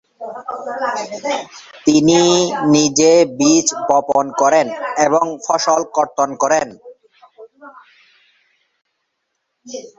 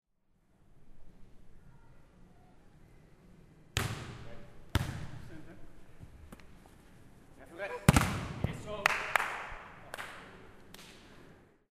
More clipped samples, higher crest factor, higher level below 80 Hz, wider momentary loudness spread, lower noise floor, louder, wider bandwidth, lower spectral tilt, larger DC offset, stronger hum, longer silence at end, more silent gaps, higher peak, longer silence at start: neither; second, 16 dB vs 36 dB; second, -58 dBFS vs -50 dBFS; second, 16 LU vs 26 LU; about the same, -73 dBFS vs -71 dBFS; first, -15 LUFS vs -34 LUFS; second, 8.2 kHz vs 15.5 kHz; about the same, -3.5 dB/octave vs -4.5 dB/octave; neither; neither; second, 0.1 s vs 0.25 s; neither; about the same, 0 dBFS vs -2 dBFS; second, 0.2 s vs 0.7 s